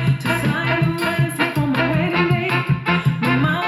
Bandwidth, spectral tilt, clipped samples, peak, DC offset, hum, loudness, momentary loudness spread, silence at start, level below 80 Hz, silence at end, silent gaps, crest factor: 15.5 kHz; -6.5 dB/octave; under 0.1%; -4 dBFS; under 0.1%; none; -19 LUFS; 2 LU; 0 s; -46 dBFS; 0 s; none; 14 dB